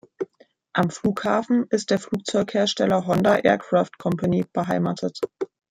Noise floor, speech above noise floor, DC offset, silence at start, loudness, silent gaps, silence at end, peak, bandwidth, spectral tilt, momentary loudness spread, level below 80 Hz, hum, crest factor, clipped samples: -57 dBFS; 35 dB; under 0.1%; 0.2 s; -23 LUFS; none; 0.25 s; -4 dBFS; 15 kHz; -5.5 dB/octave; 10 LU; -60 dBFS; none; 20 dB; under 0.1%